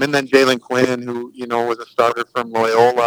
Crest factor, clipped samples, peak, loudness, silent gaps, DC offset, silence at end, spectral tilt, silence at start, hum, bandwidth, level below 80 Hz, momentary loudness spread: 16 dB; under 0.1%; 0 dBFS; -17 LUFS; none; under 0.1%; 0 s; -4.5 dB/octave; 0 s; none; over 20 kHz; -68 dBFS; 9 LU